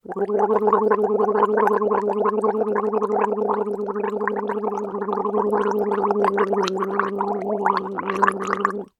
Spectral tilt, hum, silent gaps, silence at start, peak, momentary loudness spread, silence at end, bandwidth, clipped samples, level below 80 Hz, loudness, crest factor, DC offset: -6.5 dB/octave; none; none; 0.1 s; 0 dBFS; 6 LU; 0.15 s; 11.5 kHz; under 0.1%; -64 dBFS; -22 LUFS; 20 dB; under 0.1%